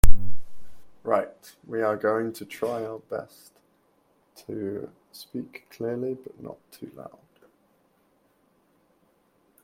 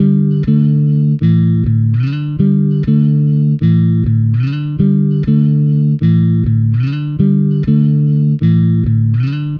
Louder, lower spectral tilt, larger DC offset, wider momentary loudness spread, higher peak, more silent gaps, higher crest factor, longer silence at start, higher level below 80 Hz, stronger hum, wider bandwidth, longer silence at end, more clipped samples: second, -31 LUFS vs -13 LUFS; second, -6 dB/octave vs -11.5 dB/octave; neither; first, 20 LU vs 3 LU; about the same, 0 dBFS vs 0 dBFS; neither; first, 22 dB vs 12 dB; about the same, 0.05 s vs 0 s; about the same, -32 dBFS vs -36 dBFS; neither; first, 16 kHz vs 4.7 kHz; first, 2.8 s vs 0 s; first, 0.1% vs under 0.1%